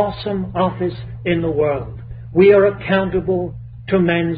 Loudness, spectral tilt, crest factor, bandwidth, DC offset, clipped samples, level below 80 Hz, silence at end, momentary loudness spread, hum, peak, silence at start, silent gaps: -17 LUFS; -12 dB/octave; 16 dB; 4.9 kHz; under 0.1%; under 0.1%; -40 dBFS; 0 s; 14 LU; none; -2 dBFS; 0 s; none